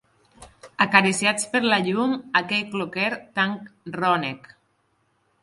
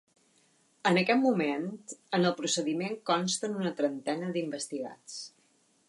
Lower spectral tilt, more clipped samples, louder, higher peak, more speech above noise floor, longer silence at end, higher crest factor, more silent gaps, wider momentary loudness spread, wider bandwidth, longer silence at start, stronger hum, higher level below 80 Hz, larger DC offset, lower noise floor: about the same, -3.5 dB/octave vs -4 dB/octave; neither; first, -22 LUFS vs -30 LUFS; first, 0 dBFS vs -12 dBFS; first, 45 dB vs 38 dB; first, 1.05 s vs 0.6 s; first, 24 dB vs 18 dB; neither; about the same, 15 LU vs 15 LU; about the same, 11.5 kHz vs 11.5 kHz; second, 0.4 s vs 0.85 s; neither; first, -66 dBFS vs -80 dBFS; neither; about the same, -68 dBFS vs -68 dBFS